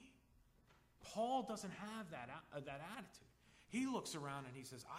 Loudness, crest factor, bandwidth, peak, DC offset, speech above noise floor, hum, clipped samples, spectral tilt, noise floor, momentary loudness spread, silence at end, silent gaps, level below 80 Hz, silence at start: -47 LUFS; 20 dB; 15.5 kHz; -30 dBFS; under 0.1%; 25 dB; none; under 0.1%; -4.5 dB/octave; -72 dBFS; 13 LU; 0 s; none; -76 dBFS; 0 s